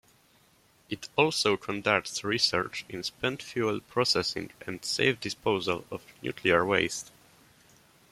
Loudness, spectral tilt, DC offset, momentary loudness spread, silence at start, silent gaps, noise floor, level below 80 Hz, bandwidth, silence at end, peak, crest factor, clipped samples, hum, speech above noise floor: -28 LUFS; -3.5 dB/octave; under 0.1%; 13 LU; 0.9 s; none; -63 dBFS; -64 dBFS; 16 kHz; 1.05 s; -6 dBFS; 24 dB; under 0.1%; none; 34 dB